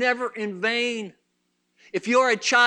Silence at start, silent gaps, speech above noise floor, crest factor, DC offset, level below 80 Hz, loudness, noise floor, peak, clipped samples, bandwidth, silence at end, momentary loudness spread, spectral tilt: 0 s; none; 50 dB; 20 dB; under 0.1%; -82 dBFS; -24 LUFS; -73 dBFS; -4 dBFS; under 0.1%; 10 kHz; 0 s; 13 LU; -2.5 dB/octave